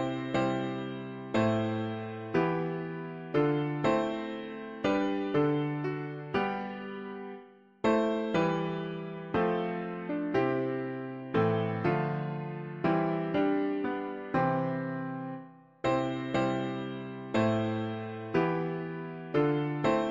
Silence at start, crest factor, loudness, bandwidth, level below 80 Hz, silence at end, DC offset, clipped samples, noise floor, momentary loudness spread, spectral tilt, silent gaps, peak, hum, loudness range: 0 s; 16 dB; -32 LUFS; 7.6 kHz; -62 dBFS; 0 s; under 0.1%; under 0.1%; -52 dBFS; 10 LU; -7.5 dB/octave; none; -14 dBFS; none; 2 LU